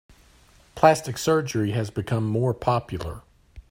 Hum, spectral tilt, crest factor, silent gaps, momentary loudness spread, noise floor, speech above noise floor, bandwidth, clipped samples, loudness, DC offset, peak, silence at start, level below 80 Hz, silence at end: none; -6 dB/octave; 24 dB; none; 14 LU; -55 dBFS; 32 dB; 16 kHz; under 0.1%; -24 LUFS; under 0.1%; -2 dBFS; 0.75 s; -50 dBFS; 0.1 s